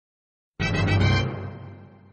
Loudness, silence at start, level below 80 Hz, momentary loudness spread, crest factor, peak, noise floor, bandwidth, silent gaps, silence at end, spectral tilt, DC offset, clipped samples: -23 LUFS; 0.6 s; -40 dBFS; 20 LU; 16 dB; -10 dBFS; -44 dBFS; 8.4 kHz; none; 0.25 s; -6 dB/octave; under 0.1%; under 0.1%